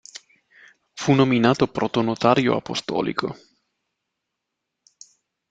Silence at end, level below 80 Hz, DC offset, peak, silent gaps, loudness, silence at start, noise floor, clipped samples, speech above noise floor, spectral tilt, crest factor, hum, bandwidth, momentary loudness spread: 2.15 s; -58 dBFS; under 0.1%; -2 dBFS; none; -21 LUFS; 0.95 s; -81 dBFS; under 0.1%; 61 dB; -6 dB/octave; 22 dB; none; 9.2 kHz; 24 LU